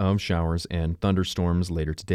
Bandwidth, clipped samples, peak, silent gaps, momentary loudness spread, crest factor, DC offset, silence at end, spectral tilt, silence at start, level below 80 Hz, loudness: 13 kHz; under 0.1%; -10 dBFS; none; 4 LU; 14 dB; under 0.1%; 0 s; -6.5 dB/octave; 0 s; -36 dBFS; -26 LUFS